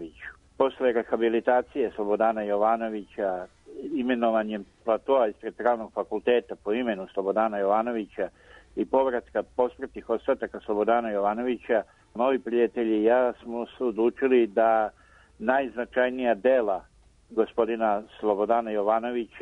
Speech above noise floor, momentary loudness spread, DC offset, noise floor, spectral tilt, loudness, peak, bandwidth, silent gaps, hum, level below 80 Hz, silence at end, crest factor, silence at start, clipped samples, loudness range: 20 dB; 10 LU; under 0.1%; -46 dBFS; -7 dB/octave; -26 LUFS; -8 dBFS; 7 kHz; none; none; -60 dBFS; 0 s; 18 dB; 0 s; under 0.1%; 3 LU